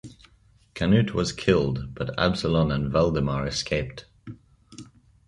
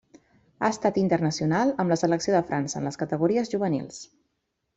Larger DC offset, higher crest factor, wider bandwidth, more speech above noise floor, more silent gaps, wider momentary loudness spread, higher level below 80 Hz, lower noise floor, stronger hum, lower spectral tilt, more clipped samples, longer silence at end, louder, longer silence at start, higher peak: neither; about the same, 20 dB vs 18 dB; first, 11.5 kHz vs 8.2 kHz; second, 35 dB vs 53 dB; neither; first, 23 LU vs 7 LU; first, -42 dBFS vs -62 dBFS; second, -59 dBFS vs -78 dBFS; neither; about the same, -6 dB/octave vs -6 dB/octave; neither; second, 0.45 s vs 0.7 s; about the same, -24 LUFS vs -25 LUFS; second, 0.05 s vs 0.6 s; about the same, -6 dBFS vs -8 dBFS